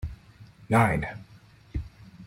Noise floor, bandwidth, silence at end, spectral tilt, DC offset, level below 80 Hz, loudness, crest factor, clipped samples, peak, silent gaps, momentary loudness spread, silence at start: -52 dBFS; 16.5 kHz; 0 s; -7 dB/octave; under 0.1%; -44 dBFS; -27 LUFS; 22 dB; under 0.1%; -8 dBFS; none; 23 LU; 0 s